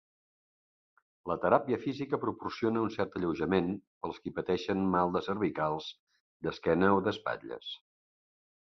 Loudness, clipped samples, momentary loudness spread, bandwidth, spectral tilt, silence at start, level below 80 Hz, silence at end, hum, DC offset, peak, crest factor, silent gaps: -32 LUFS; under 0.1%; 13 LU; 6.4 kHz; -7.5 dB/octave; 1.25 s; -60 dBFS; 0.9 s; none; under 0.1%; -10 dBFS; 24 dB; 3.87-4.01 s, 5.99-6.07 s, 6.20-6.40 s